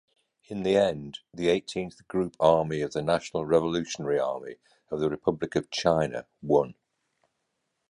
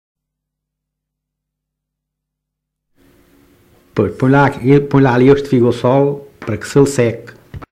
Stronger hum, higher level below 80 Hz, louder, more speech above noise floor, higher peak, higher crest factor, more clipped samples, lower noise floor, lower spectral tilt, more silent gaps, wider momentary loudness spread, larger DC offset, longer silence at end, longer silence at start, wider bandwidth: neither; second, -58 dBFS vs -44 dBFS; second, -27 LUFS vs -13 LUFS; second, 52 dB vs 66 dB; second, -6 dBFS vs 0 dBFS; first, 22 dB vs 16 dB; neither; about the same, -79 dBFS vs -78 dBFS; second, -5.5 dB/octave vs -7.5 dB/octave; neither; about the same, 13 LU vs 13 LU; neither; first, 1.2 s vs 0.05 s; second, 0.5 s vs 3.95 s; second, 11 kHz vs 14 kHz